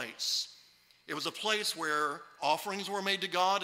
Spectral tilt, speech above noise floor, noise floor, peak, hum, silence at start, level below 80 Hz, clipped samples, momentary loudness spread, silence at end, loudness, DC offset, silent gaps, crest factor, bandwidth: -1.5 dB/octave; 30 dB; -63 dBFS; -14 dBFS; none; 0 s; -84 dBFS; under 0.1%; 7 LU; 0 s; -33 LUFS; under 0.1%; none; 20 dB; 16 kHz